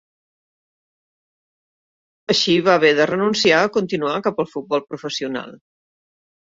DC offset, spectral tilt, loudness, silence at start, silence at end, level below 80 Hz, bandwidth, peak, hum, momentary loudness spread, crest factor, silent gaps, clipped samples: under 0.1%; -4 dB/octave; -18 LUFS; 2.3 s; 1 s; -64 dBFS; 7.8 kHz; -2 dBFS; none; 13 LU; 20 dB; none; under 0.1%